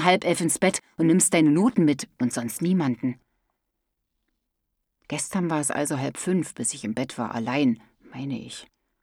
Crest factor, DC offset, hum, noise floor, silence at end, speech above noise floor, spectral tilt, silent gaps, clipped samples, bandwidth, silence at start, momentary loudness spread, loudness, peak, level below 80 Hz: 22 dB; under 0.1%; none; -80 dBFS; 0.4 s; 56 dB; -4.5 dB/octave; none; under 0.1%; 17 kHz; 0 s; 14 LU; -24 LUFS; -4 dBFS; -66 dBFS